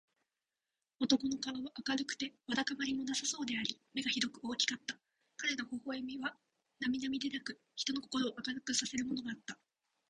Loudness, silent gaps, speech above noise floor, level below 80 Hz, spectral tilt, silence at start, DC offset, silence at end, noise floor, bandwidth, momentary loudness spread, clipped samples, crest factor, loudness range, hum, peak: -38 LUFS; none; over 52 dB; -76 dBFS; -1.5 dB/octave; 1 s; under 0.1%; 0.55 s; under -90 dBFS; 10 kHz; 9 LU; under 0.1%; 24 dB; 3 LU; none; -16 dBFS